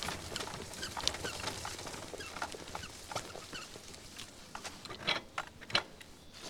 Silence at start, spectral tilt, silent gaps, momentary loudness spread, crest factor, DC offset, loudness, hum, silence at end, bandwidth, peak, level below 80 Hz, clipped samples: 0 s; -2 dB/octave; none; 13 LU; 36 dB; under 0.1%; -40 LUFS; none; 0 s; 19.5 kHz; -6 dBFS; -60 dBFS; under 0.1%